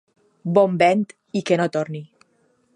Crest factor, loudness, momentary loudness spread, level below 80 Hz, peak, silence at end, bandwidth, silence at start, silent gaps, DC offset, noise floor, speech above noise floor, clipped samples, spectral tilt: 20 dB; -20 LUFS; 15 LU; -70 dBFS; -2 dBFS; 0.7 s; 11.5 kHz; 0.45 s; none; under 0.1%; -63 dBFS; 44 dB; under 0.1%; -6.5 dB/octave